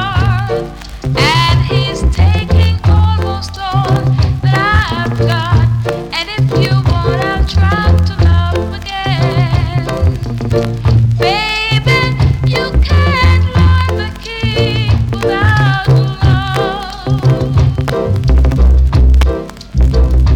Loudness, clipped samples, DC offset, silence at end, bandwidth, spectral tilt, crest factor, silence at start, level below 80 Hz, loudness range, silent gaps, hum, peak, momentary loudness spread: -12 LUFS; under 0.1%; under 0.1%; 0 s; 11.5 kHz; -6.5 dB/octave; 8 dB; 0 s; -16 dBFS; 2 LU; none; none; -2 dBFS; 7 LU